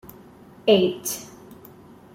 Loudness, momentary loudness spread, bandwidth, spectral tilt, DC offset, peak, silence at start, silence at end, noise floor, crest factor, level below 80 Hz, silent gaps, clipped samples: -22 LUFS; 24 LU; 16.5 kHz; -4 dB/octave; under 0.1%; -4 dBFS; 0.65 s; 0.6 s; -47 dBFS; 20 dB; -62 dBFS; none; under 0.1%